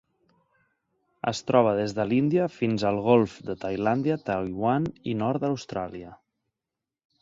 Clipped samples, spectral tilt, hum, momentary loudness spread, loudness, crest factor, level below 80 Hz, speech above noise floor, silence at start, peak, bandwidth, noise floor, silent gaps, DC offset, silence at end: under 0.1%; -7 dB/octave; none; 11 LU; -26 LUFS; 22 dB; -58 dBFS; 63 dB; 1.25 s; -6 dBFS; 7.8 kHz; -88 dBFS; none; under 0.1%; 1.05 s